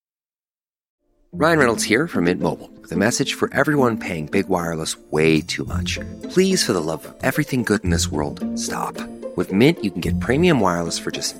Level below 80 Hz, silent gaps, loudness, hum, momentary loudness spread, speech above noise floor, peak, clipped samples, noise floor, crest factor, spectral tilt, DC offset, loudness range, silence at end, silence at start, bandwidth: -46 dBFS; none; -20 LUFS; none; 9 LU; over 70 dB; -2 dBFS; under 0.1%; under -90 dBFS; 20 dB; -4.5 dB/octave; under 0.1%; 2 LU; 0 s; 1.35 s; 16.5 kHz